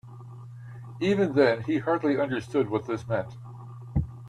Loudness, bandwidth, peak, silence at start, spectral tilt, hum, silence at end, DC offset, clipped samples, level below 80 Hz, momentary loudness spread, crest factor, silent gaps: -27 LUFS; 11 kHz; -8 dBFS; 0.05 s; -7.5 dB/octave; none; 0 s; under 0.1%; under 0.1%; -48 dBFS; 21 LU; 20 dB; none